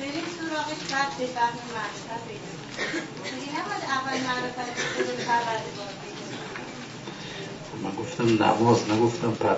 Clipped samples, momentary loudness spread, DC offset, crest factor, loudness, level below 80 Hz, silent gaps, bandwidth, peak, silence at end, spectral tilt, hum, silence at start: under 0.1%; 15 LU; under 0.1%; 20 dB; -28 LUFS; -62 dBFS; none; 8 kHz; -8 dBFS; 0 s; -4.5 dB/octave; none; 0 s